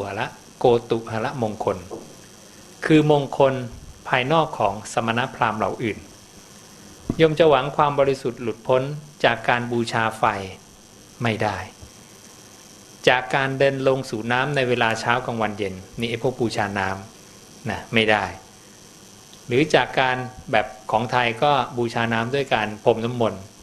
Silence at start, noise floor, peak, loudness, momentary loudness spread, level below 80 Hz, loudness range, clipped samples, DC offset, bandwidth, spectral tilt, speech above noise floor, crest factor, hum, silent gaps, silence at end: 0 s; -47 dBFS; 0 dBFS; -22 LUFS; 12 LU; -52 dBFS; 4 LU; under 0.1%; under 0.1%; 13.5 kHz; -5.5 dB/octave; 26 dB; 22 dB; none; none; 0 s